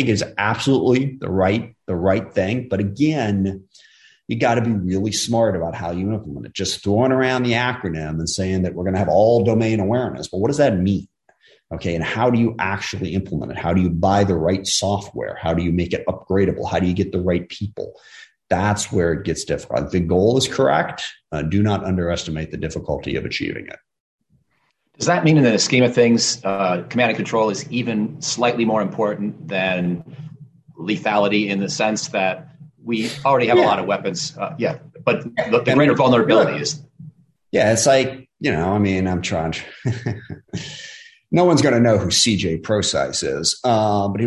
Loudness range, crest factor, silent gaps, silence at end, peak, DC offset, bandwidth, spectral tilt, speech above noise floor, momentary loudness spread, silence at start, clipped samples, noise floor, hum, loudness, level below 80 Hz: 5 LU; 16 dB; 24.00-24.18 s; 0 s; -4 dBFS; under 0.1%; 12.5 kHz; -5 dB/octave; 48 dB; 12 LU; 0 s; under 0.1%; -67 dBFS; none; -19 LUFS; -42 dBFS